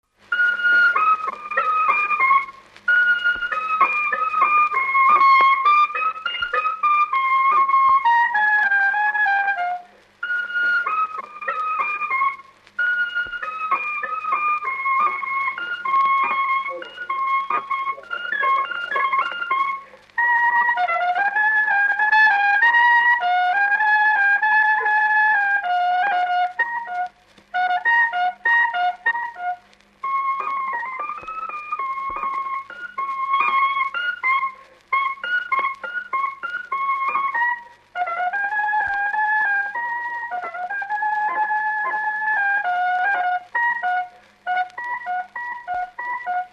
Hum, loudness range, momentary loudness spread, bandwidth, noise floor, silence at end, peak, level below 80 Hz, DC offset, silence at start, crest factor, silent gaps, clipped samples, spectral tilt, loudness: 50 Hz at -70 dBFS; 7 LU; 12 LU; 8 kHz; -47 dBFS; 0.05 s; -4 dBFS; -66 dBFS; under 0.1%; 0.3 s; 16 dB; none; under 0.1%; -2 dB/octave; -19 LUFS